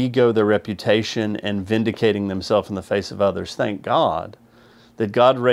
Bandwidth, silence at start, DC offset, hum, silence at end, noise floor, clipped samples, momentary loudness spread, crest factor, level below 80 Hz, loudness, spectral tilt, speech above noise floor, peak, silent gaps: 13.5 kHz; 0 s; under 0.1%; none; 0 s; -50 dBFS; under 0.1%; 8 LU; 18 dB; -56 dBFS; -20 LUFS; -6 dB/octave; 31 dB; -2 dBFS; none